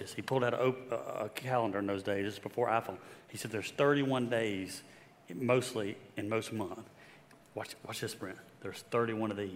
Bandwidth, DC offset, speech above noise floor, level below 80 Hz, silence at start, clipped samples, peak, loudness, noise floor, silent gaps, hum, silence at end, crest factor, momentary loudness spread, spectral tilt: 16 kHz; under 0.1%; 24 dB; -78 dBFS; 0 s; under 0.1%; -14 dBFS; -35 LUFS; -59 dBFS; none; none; 0 s; 20 dB; 15 LU; -5.5 dB/octave